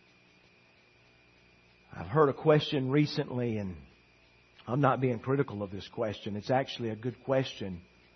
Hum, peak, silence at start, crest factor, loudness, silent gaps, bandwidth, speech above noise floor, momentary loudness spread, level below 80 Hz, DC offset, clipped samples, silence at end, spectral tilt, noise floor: none; -10 dBFS; 1.9 s; 22 dB; -31 LUFS; none; 6.4 kHz; 33 dB; 15 LU; -66 dBFS; under 0.1%; under 0.1%; 0.35 s; -7.5 dB/octave; -63 dBFS